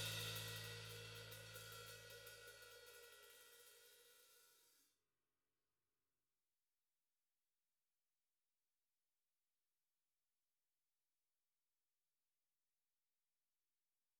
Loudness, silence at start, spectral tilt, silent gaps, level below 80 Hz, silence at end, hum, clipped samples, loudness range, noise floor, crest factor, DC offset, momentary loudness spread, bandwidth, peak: -54 LUFS; 0 s; -2 dB/octave; none; -82 dBFS; 9.35 s; none; under 0.1%; 14 LU; under -90 dBFS; 24 dB; under 0.1%; 19 LU; over 20 kHz; -36 dBFS